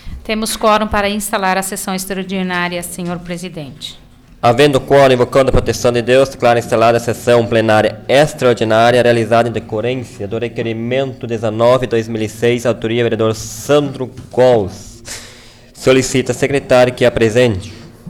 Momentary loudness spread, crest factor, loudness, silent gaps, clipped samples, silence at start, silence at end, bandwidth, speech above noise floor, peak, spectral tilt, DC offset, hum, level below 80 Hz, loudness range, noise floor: 13 LU; 12 dB; -14 LUFS; none; under 0.1%; 0.05 s; 0 s; 18 kHz; 26 dB; -2 dBFS; -5 dB/octave; under 0.1%; none; -34 dBFS; 5 LU; -39 dBFS